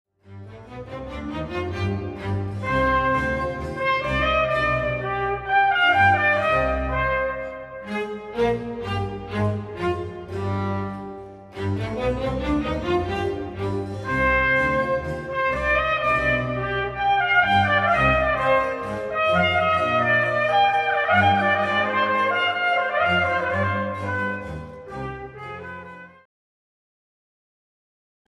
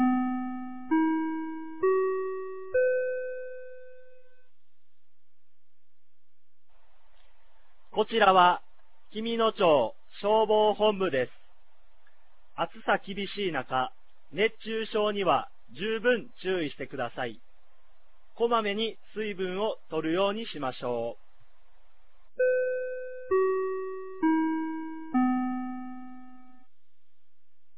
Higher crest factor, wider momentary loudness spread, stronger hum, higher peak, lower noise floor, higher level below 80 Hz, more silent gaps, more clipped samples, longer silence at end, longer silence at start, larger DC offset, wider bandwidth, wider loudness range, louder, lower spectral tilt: about the same, 18 dB vs 22 dB; about the same, 15 LU vs 14 LU; neither; about the same, -6 dBFS vs -8 dBFS; first, under -90 dBFS vs -83 dBFS; first, -40 dBFS vs -68 dBFS; neither; neither; first, 2.2 s vs 1.4 s; first, 0.3 s vs 0 s; second, under 0.1% vs 0.9%; first, 11.5 kHz vs 4 kHz; about the same, 8 LU vs 7 LU; first, -22 LUFS vs -29 LUFS; second, -6.5 dB/octave vs -8.5 dB/octave